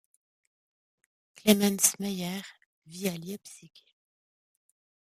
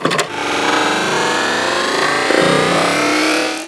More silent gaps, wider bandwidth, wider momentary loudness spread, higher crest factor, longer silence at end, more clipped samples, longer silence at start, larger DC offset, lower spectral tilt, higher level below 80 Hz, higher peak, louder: first, 2.66-2.82 s vs none; first, 15.5 kHz vs 11 kHz; first, 23 LU vs 4 LU; first, 26 dB vs 16 dB; first, 1.4 s vs 0 s; neither; first, 1.45 s vs 0 s; neither; about the same, -3.5 dB/octave vs -3 dB/octave; second, -72 dBFS vs -54 dBFS; second, -6 dBFS vs 0 dBFS; second, -27 LUFS vs -14 LUFS